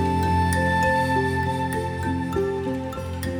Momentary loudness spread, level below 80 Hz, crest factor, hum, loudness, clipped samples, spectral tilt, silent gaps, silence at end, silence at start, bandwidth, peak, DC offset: 8 LU; -44 dBFS; 14 dB; none; -23 LUFS; under 0.1%; -6 dB/octave; none; 0 s; 0 s; 18.5 kHz; -10 dBFS; under 0.1%